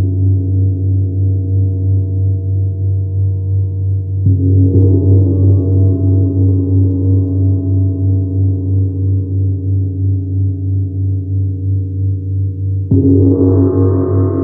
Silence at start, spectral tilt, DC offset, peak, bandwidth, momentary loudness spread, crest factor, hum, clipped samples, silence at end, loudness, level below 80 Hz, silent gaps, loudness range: 0 s; -15 dB/octave; under 0.1%; -2 dBFS; 1.4 kHz; 7 LU; 10 dB; none; under 0.1%; 0 s; -14 LUFS; -44 dBFS; none; 5 LU